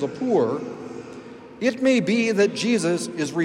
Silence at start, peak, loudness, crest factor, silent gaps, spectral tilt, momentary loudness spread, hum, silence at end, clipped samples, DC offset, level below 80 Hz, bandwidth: 0 s; -8 dBFS; -22 LUFS; 14 dB; none; -5 dB/octave; 18 LU; none; 0 s; under 0.1%; under 0.1%; -68 dBFS; 12.5 kHz